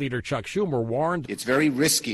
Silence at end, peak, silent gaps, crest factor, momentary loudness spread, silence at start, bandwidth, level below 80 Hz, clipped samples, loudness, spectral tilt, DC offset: 0 s; -10 dBFS; none; 14 dB; 8 LU; 0 s; 12.5 kHz; -54 dBFS; under 0.1%; -24 LUFS; -4 dB/octave; under 0.1%